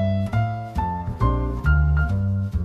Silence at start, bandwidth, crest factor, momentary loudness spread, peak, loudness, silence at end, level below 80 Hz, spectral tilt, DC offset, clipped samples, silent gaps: 0 s; 6 kHz; 14 dB; 7 LU; -6 dBFS; -23 LUFS; 0 s; -26 dBFS; -9 dB/octave; under 0.1%; under 0.1%; none